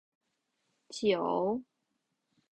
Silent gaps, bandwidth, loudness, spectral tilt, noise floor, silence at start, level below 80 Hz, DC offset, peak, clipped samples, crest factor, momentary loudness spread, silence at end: none; 10.5 kHz; -32 LUFS; -5 dB/octave; -82 dBFS; 0.9 s; -74 dBFS; under 0.1%; -18 dBFS; under 0.1%; 18 dB; 10 LU; 0.9 s